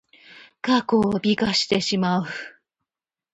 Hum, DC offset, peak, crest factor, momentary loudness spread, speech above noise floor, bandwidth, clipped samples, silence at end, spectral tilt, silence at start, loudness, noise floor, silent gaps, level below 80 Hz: none; under 0.1%; -6 dBFS; 16 dB; 12 LU; 68 dB; 8.8 kHz; under 0.1%; 0.85 s; -5 dB/octave; 0.3 s; -22 LUFS; -90 dBFS; none; -56 dBFS